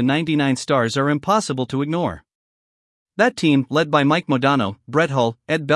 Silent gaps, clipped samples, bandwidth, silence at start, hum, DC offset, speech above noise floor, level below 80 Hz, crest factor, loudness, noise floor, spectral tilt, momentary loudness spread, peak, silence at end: 2.35-3.06 s; under 0.1%; 12 kHz; 0 s; none; under 0.1%; over 71 dB; -60 dBFS; 18 dB; -19 LUFS; under -90 dBFS; -5.5 dB/octave; 6 LU; -2 dBFS; 0 s